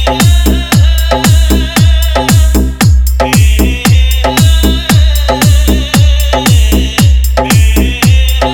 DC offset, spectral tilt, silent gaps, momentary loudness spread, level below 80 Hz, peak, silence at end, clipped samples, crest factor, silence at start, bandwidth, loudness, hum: 1%; -5 dB/octave; none; 2 LU; -10 dBFS; 0 dBFS; 0 s; 0.6%; 6 dB; 0 s; 20 kHz; -8 LUFS; none